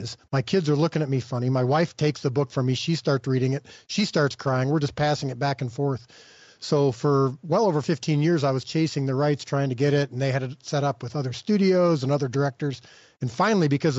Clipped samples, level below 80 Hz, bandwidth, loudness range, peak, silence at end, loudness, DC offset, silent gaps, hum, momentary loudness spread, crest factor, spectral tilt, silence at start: under 0.1%; -62 dBFS; 8 kHz; 2 LU; -10 dBFS; 0 s; -24 LUFS; under 0.1%; none; none; 7 LU; 14 dB; -6 dB/octave; 0 s